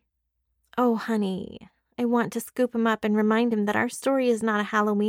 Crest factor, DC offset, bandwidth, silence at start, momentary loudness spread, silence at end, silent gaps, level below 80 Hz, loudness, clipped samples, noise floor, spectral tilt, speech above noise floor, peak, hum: 16 dB; under 0.1%; 16.5 kHz; 0.75 s; 8 LU; 0 s; none; -68 dBFS; -25 LUFS; under 0.1%; -77 dBFS; -5.5 dB/octave; 53 dB; -10 dBFS; none